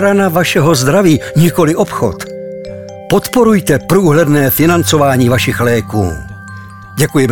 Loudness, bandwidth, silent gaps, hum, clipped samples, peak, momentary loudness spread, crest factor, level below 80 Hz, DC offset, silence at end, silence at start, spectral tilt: -11 LUFS; over 20 kHz; none; none; under 0.1%; 0 dBFS; 16 LU; 10 dB; -38 dBFS; 1%; 0 s; 0 s; -5.5 dB/octave